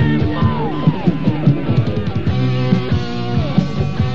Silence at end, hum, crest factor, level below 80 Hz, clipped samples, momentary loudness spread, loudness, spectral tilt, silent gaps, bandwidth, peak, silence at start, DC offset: 0 s; none; 16 dB; -34 dBFS; under 0.1%; 4 LU; -17 LUFS; -8.5 dB/octave; none; 7 kHz; 0 dBFS; 0 s; 5%